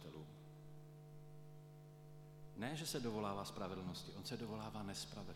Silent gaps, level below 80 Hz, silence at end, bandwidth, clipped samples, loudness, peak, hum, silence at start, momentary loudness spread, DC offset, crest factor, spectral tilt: none; -70 dBFS; 0 s; 17.5 kHz; under 0.1%; -47 LUFS; -28 dBFS; 50 Hz at -60 dBFS; 0 s; 16 LU; under 0.1%; 20 dB; -4.5 dB/octave